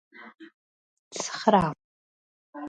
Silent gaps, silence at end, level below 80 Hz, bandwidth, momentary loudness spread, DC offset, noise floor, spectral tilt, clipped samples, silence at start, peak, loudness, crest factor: 0.54-1.11 s, 1.84-2.53 s; 0 s; -60 dBFS; 10.5 kHz; 25 LU; under 0.1%; under -90 dBFS; -4.5 dB/octave; under 0.1%; 0.15 s; -6 dBFS; -25 LUFS; 24 dB